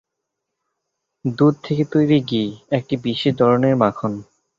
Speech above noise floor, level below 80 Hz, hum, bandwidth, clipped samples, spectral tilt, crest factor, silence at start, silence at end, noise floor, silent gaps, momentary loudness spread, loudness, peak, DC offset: 62 dB; -56 dBFS; none; 7.4 kHz; under 0.1%; -8 dB/octave; 18 dB; 1.25 s; 0.35 s; -79 dBFS; none; 11 LU; -19 LUFS; -2 dBFS; under 0.1%